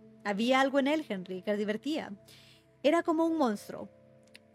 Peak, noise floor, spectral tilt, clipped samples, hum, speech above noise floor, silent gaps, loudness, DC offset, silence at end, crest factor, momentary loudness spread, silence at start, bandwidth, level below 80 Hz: -12 dBFS; -58 dBFS; -5 dB/octave; under 0.1%; none; 28 dB; none; -30 LUFS; under 0.1%; 0.65 s; 20 dB; 18 LU; 0.05 s; 14.5 kHz; -78 dBFS